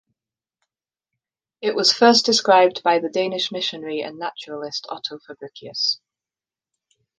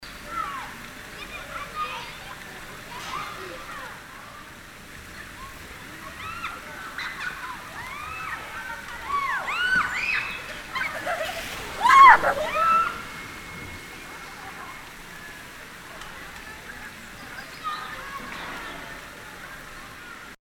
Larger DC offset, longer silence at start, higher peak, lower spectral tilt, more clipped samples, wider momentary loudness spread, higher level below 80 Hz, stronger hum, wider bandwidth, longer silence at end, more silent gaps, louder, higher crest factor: neither; first, 1.6 s vs 0 s; about the same, -2 dBFS vs -2 dBFS; about the same, -2.5 dB/octave vs -2.5 dB/octave; neither; about the same, 17 LU vs 18 LU; second, -74 dBFS vs -50 dBFS; neither; second, 10 kHz vs 18.5 kHz; first, 1.25 s vs 0.05 s; neither; first, -19 LUFS vs -24 LUFS; second, 20 dB vs 26 dB